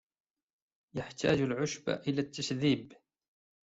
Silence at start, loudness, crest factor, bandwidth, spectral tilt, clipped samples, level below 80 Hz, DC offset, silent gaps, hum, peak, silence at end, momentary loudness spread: 0.95 s; -33 LUFS; 22 dB; 8 kHz; -5.5 dB/octave; under 0.1%; -66 dBFS; under 0.1%; none; none; -14 dBFS; 0.75 s; 11 LU